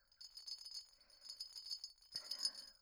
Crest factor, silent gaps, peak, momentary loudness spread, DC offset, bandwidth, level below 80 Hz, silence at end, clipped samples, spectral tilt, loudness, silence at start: 26 dB; none; -26 dBFS; 14 LU; under 0.1%; over 20 kHz; -84 dBFS; 0.05 s; under 0.1%; 2 dB/octave; -47 LUFS; 0.1 s